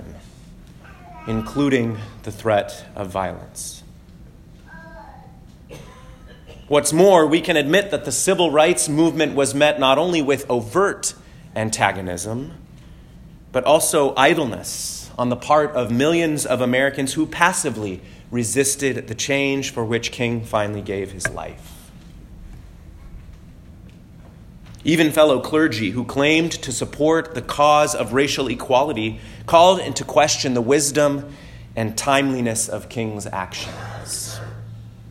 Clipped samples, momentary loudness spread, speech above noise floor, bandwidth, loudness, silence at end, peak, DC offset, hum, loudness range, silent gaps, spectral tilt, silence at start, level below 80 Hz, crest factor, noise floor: under 0.1%; 16 LU; 24 dB; 16.5 kHz; -19 LUFS; 0 s; 0 dBFS; under 0.1%; none; 10 LU; none; -4 dB/octave; 0 s; -46 dBFS; 20 dB; -43 dBFS